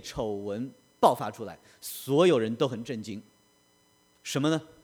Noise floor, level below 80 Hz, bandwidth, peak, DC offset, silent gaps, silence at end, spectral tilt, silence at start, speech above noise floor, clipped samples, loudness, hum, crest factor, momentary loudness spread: -65 dBFS; -62 dBFS; over 20 kHz; -8 dBFS; under 0.1%; none; 0.15 s; -5.5 dB/octave; 0.05 s; 37 dB; under 0.1%; -28 LUFS; none; 22 dB; 19 LU